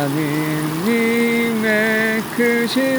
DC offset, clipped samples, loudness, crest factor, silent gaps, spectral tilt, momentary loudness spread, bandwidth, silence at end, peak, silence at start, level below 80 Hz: under 0.1%; under 0.1%; -17 LUFS; 14 dB; none; -5 dB/octave; 4 LU; over 20 kHz; 0 s; -4 dBFS; 0 s; -56 dBFS